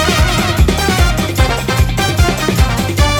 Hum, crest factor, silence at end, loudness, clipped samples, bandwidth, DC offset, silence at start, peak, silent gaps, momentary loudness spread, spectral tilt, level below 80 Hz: none; 12 dB; 0 s; -13 LUFS; under 0.1%; over 20 kHz; under 0.1%; 0 s; 0 dBFS; none; 2 LU; -4.5 dB/octave; -18 dBFS